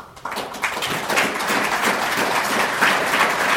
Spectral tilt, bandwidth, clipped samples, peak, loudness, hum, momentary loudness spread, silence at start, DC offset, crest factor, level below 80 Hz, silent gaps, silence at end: -2 dB/octave; 18 kHz; under 0.1%; -2 dBFS; -19 LUFS; none; 7 LU; 0 s; under 0.1%; 18 dB; -56 dBFS; none; 0 s